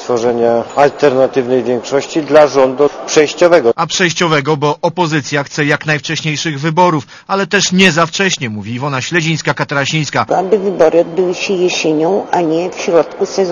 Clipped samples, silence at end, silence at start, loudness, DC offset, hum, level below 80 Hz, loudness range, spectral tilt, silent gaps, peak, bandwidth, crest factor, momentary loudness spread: 0.4%; 0 s; 0 s; -13 LUFS; under 0.1%; none; -52 dBFS; 3 LU; -4.5 dB/octave; none; 0 dBFS; 10 kHz; 12 dB; 7 LU